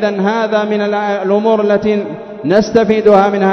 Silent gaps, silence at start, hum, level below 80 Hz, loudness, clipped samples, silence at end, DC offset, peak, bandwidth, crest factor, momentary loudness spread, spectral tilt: none; 0 s; none; -48 dBFS; -13 LUFS; 0.3%; 0 s; under 0.1%; 0 dBFS; 6.4 kHz; 12 dB; 7 LU; -6.5 dB/octave